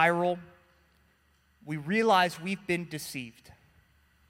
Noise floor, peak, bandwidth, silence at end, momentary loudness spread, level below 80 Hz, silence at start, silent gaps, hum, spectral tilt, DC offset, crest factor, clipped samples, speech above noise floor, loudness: -67 dBFS; -10 dBFS; 16.5 kHz; 1 s; 15 LU; -68 dBFS; 0 s; none; none; -5 dB/octave; under 0.1%; 22 dB; under 0.1%; 39 dB; -29 LUFS